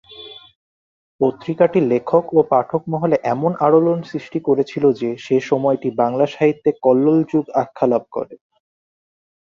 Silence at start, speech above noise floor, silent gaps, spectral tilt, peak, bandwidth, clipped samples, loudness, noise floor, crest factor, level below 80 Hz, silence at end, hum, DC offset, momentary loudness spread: 0.1 s; 22 dB; 0.56-1.19 s; -8 dB/octave; -2 dBFS; 7.2 kHz; under 0.1%; -18 LUFS; -39 dBFS; 18 dB; -62 dBFS; 1.2 s; none; under 0.1%; 9 LU